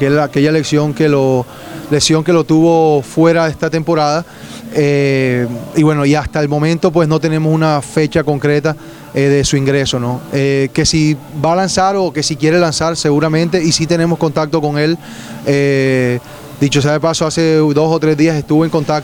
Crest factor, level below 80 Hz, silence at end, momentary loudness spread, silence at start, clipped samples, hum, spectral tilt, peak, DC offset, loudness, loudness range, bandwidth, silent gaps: 12 dB; -42 dBFS; 0 s; 6 LU; 0 s; under 0.1%; none; -5.5 dB/octave; 0 dBFS; under 0.1%; -13 LUFS; 2 LU; 18 kHz; none